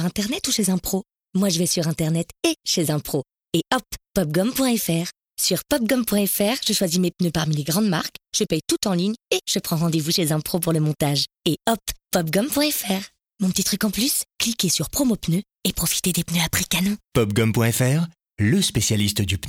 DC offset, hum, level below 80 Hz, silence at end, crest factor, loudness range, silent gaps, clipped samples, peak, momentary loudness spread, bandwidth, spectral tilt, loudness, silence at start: under 0.1%; none; -48 dBFS; 0 s; 14 dB; 2 LU; none; under 0.1%; -8 dBFS; 6 LU; 18 kHz; -4 dB/octave; -22 LUFS; 0 s